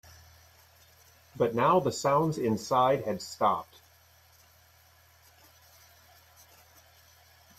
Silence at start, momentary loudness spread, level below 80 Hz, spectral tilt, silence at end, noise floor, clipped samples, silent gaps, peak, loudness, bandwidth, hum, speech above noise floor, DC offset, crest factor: 1.35 s; 8 LU; -66 dBFS; -5.5 dB/octave; 3.95 s; -60 dBFS; under 0.1%; none; -12 dBFS; -28 LUFS; 14 kHz; none; 33 dB; under 0.1%; 20 dB